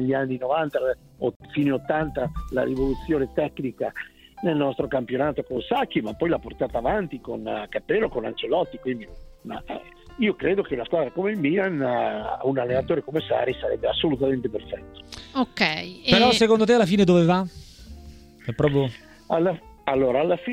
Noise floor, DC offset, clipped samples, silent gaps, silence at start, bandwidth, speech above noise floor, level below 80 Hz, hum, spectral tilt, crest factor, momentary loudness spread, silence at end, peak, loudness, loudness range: -45 dBFS; under 0.1%; under 0.1%; 1.36-1.40 s; 0 s; 15.5 kHz; 21 dB; -46 dBFS; none; -6 dB/octave; 22 dB; 16 LU; 0 s; -2 dBFS; -24 LUFS; 7 LU